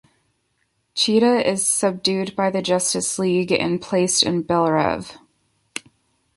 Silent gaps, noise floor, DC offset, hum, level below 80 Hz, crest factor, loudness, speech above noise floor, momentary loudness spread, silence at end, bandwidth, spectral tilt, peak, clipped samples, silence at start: none; -69 dBFS; under 0.1%; none; -58 dBFS; 20 dB; -19 LUFS; 50 dB; 14 LU; 0.55 s; 12 kHz; -3.5 dB/octave; -2 dBFS; under 0.1%; 0.95 s